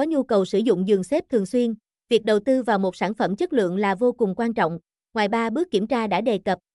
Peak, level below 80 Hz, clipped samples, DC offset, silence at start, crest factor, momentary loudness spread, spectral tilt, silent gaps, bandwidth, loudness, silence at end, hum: -8 dBFS; -62 dBFS; under 0.1%; under 0.1%; 0 s; 14 dB; 5 LU; -6.5 dB/octave; none; 12 kHz; -22 LUFS; 0.2 s; none